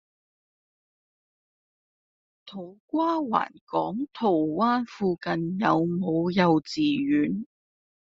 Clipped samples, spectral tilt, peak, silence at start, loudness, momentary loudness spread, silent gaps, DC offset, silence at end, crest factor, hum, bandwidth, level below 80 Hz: under 0.1%; -5.5 dB/octave; -6 dBFS; 2.45 s; -26 LUFS; 11 LU; 2.80-2.88 s, 3.61-3.67 s; under 0.1%; 0.75 s; 20 dB; none; 7.6 kHz; -66 dBFS